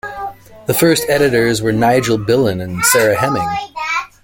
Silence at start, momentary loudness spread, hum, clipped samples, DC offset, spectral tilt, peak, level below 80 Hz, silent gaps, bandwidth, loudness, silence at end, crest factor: 0.05 s; 10 LU; none; under 0.1%; under 0.1%; -4 dB/octave; 0 dBFS; -44 dBFS; none; 17 kHz; -14 LUFS; 0.2 s; 14 dB